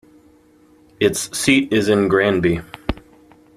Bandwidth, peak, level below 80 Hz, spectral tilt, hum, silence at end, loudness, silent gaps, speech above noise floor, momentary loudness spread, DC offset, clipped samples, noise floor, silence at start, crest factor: 15 kHz; -2 dBFS; -40 dBFS; -4.5 dB/octave; none; 0.6 s; -18 LUFS; none; 35 dB; 13 LU; under 0.1%; under 0.1%; -52 dBFS; 1 s; 18 dB